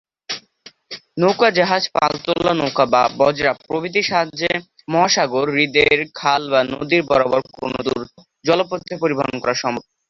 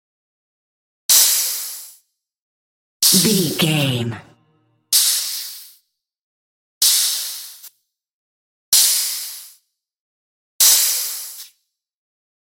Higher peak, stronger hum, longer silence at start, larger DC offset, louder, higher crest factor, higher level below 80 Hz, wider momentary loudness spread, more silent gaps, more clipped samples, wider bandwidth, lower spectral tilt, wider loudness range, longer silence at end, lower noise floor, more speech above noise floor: about the same, -2 dBFS vs 0 dBFS; neither; second, 0.3 s vs 1.1 s; neither; second, -18 LUFS vs -15 LUFS; about the same, 18 dB vs 22 dB; first, -54 dBFS vs -68 dBFS; second, 11 LU vs 20 LU; second, none vs 2.39-3.00 s, 6.23-6.81 s, 8.11-8.72 s, 10.00-10.59 s; neither; second, 7.4 kHz vs 17 kHz; first, -4 dB/octave vs -1.5 dB/octave; about the same, 3 LU vs 4 LU; second, 0.3 s vs 1 s; second, -47 dBFS vs -66 dBFS; second, 29 dB vs 49 dB